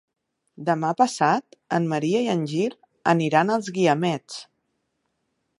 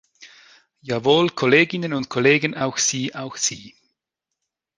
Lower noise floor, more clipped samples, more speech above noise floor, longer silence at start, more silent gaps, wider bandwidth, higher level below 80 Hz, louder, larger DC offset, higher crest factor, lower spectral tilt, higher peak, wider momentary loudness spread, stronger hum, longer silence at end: second, -75 dBFS vs -83 dBFS; neither; second, 53 dB vs 62 dB; first, 0.6 s vs 0.2 s; neither; about the same, 11.5 kHz vs 10.5 kHz; second, -74 dBFS vs -62 dBFS; second, -23 LUFS vs -20 LUFS; neither; about the same, 20 dB vs 20 dB; first, -5.5 dB/octave vs -3.5 dB/octave; about the same, -4 dBFS vs -2 dBFS; second, 9 LU vs 12 LU; neither; about the same, 1.15 s vs 1.1 s